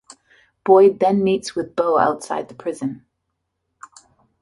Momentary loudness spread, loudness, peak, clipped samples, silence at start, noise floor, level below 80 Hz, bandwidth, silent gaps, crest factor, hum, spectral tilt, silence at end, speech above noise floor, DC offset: 16 LU; -19 LUFS; -2 dBFS; under 0.1%; 0.65 s; -75 dBFS; -62 dBFS; 11.5 kHz; none; 18 dB; none; -6 dB/octave; 1.45 s; 58 dB; under 0.1%